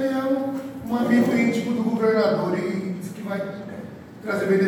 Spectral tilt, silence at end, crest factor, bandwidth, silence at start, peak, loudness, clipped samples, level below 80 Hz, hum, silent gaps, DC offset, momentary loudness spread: -7 dB/octave; 0 s; 16 dB; 18 kHz; 0 s; -6 dBFS; -23 LUFS; under 0.1%; -62 dBFS; none; none; under 0.1%; 15 LU